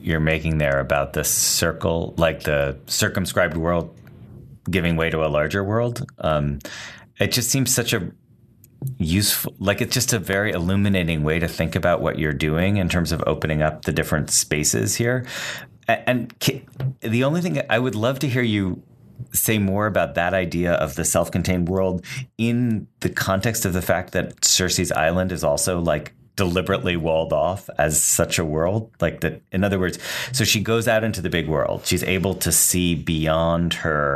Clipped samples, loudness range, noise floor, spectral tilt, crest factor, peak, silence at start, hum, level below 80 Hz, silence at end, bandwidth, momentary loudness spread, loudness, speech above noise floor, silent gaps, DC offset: under 0.1%; 3 LU; -52 dBFS; -4 dB/octave; 18 dB; -4 dBFS; 0 s; none; -42 dBFS; 0 s; 14 kHz; 7 LU; -21 LUFS; 31 dB; none; under 0.1%